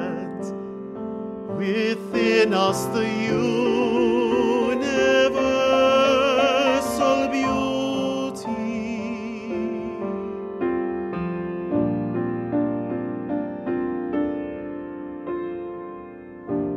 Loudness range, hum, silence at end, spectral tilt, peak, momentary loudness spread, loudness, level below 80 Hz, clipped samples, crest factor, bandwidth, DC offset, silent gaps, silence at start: 9 LU; none; 0 s; -5 dB/octave; -6 dBFS; 14 LU; -23 LUFS; -52 dBFS; under 0.1%; 16 dB; 14 kHz; under 0.1%; none; 0 s